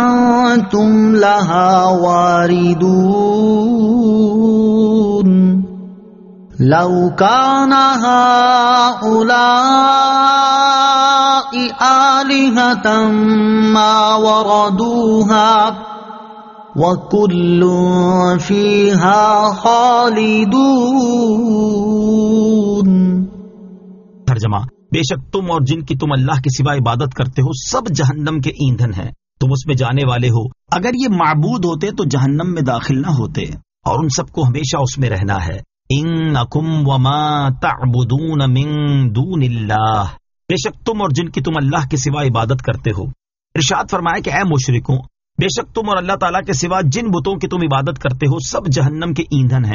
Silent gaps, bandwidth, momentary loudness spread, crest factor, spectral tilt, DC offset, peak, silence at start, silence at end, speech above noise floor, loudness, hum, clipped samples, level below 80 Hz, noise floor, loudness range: none; 7.4 kHz; 9 LU; 14 dB; -5.5 dB/octave; under 0.1%; 0 dBFS; 0 s; 0 s; 26 dB; -13 LUFS; none; under 0.1%; -40 dBFS; -38 dBFS; 7 LU